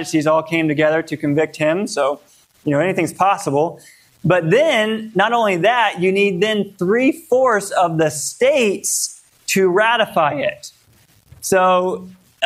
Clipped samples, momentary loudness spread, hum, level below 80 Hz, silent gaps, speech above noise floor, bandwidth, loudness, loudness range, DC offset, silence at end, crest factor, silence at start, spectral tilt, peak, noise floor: under 0.1%; 8 LU; none; -60 dBFS; none; 37 dB; 16 kHz; -17 LUFS; 2 LU; under 0.1%; 0 s; 16 dB; 0 s; -4 dB/octave; -2 dBFS; -53 dBFS